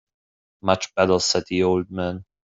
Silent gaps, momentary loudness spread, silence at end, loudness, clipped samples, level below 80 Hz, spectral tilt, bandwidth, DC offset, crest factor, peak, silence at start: none; 10 LU; 0.3 s; -22 LUFS; under 0.1%; -60 dBFS; -4 dB/octave; 8.2 kHz; under 0.1%; 20 dB; -4 dBFS; 0.65 s